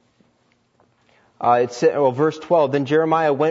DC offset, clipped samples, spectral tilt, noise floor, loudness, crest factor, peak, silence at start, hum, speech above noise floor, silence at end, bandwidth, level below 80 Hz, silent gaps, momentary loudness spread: under 0.1%; under 0.1%; -6.5 dB/octave; -63 dBFS; -18 LUFS; 16 dB; -4 dBFS; 1.4 s; none; 45 dB; 0 s; 7.8 kHz; -70 dBFS; none; 2 LU